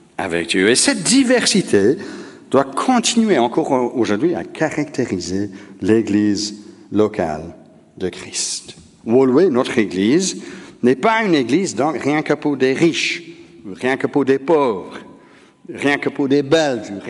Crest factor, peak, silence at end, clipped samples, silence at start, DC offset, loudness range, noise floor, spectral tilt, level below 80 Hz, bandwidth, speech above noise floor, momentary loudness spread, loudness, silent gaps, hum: 18 dB; 0 dBFS; 0 s; under 0.1%; 0.2 s; under 0.1%; 5 LU; -47 dBFS; -4 dB/octave; -56 dBFS; 11.5 kHz; 30 dB; 13 LU; -17 LUFS; none; none